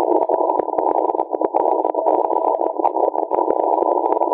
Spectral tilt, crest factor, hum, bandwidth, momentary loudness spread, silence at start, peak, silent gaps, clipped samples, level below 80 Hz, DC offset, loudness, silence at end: -10 dB/octave; 16 dB; none; 3.9 kHz; 2 LU; 0 s; -2 dBFS; none; under 0.1%; -66 dBFS; under 0.1%; -19 LUFS; 0 s